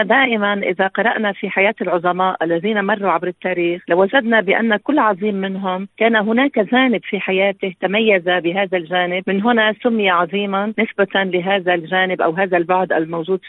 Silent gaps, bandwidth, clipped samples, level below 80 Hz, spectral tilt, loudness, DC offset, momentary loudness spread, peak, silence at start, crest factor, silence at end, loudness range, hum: none; 4.1 kHz; under 0.1%; -64 dBFS; -9 dB/octave; -17 LUFS; under 0.1%; 5 LU; 0 dBFS; 0 s; 16 dB; 0 s; 1 LU; none